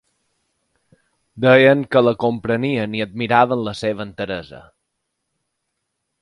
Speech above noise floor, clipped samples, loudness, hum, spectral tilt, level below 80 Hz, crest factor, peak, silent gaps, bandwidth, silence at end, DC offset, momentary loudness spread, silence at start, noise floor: 58 dB; under 0.1%; -17 LUFS; none; -7 dB/octave; -56 dBFS; 20 dB; 0 dBFS; none; 11 kHz; 1.6 s; under 0.1%; 14 LU; 1.35 s; -76 dBFS